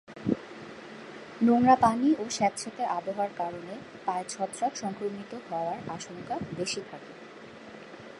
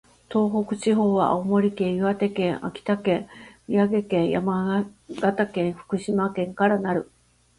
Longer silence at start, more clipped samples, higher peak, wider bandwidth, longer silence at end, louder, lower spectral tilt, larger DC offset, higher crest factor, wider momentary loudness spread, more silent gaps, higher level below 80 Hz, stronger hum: second, 0.1 s vs 0.3 s; neither; about the same, -8 dBFS vs -8 dBFS; about the same, 11.5 kHz vs 11 kHz; second, 0 s vs 0.55 s; second, -29 LUFS vs -24 LUFS; second, -4.5 dB/octave vs -7 dB/octave; neither; first, 22 dB vs 16 dB; first, 22 LU vs 7 LU; neither; second, -66 dBFS vs -58 dBFS; neither